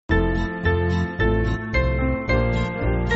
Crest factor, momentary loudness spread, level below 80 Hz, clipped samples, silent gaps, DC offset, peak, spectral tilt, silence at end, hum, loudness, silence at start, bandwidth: 14 dB; 2 LU; -26 dBFS; under 0.1%; none; under 0.1%; -6 dBFS; -6 dB/octave; 0 s; none; -22 LUFS; 0.1 s; 8 kHz